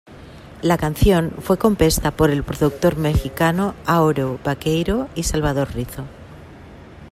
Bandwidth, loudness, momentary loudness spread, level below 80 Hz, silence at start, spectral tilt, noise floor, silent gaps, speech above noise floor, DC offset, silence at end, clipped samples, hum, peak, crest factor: 16 kHz; -19 LUFS; 7 LU; -32 dBFS; 0.1 s; -6 dB/octave; -40 dBFS; none; 22 dB; under 0.1%; 0 s; under 0.1%; none; -2 dBFS; 18 dB